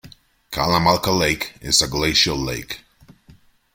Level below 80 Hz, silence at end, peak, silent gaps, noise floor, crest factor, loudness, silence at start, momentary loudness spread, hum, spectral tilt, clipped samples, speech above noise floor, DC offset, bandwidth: -40 dBFS; 0.95 s; -2 dBFS; none; -51 dBFS; 18 dB; -18 LUFS; 0.05 s; 13 LU; none; -3 dB/octave; under 0.1%; 32 dB; under 0.1%; 16.5 kHz